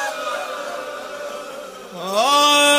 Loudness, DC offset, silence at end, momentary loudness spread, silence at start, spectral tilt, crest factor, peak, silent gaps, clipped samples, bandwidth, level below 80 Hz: -19 LUFS; under 0.1%; 0 s; 20 LU; 0 s; -0.5 dB/octave; 18 dB; -2 dBFS; none; under 0.1%; 16 kHz; -68 dBFS